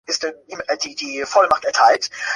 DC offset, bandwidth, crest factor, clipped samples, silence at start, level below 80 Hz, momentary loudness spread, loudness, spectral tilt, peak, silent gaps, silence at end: under 0.1%; 11.5 kHz; 18 dB; under 0.1%; 0.1 s; -60 dBFS; 11 LU; -18 LUFS; -0.5 dB/octave; -2 dBFS; none; 0 s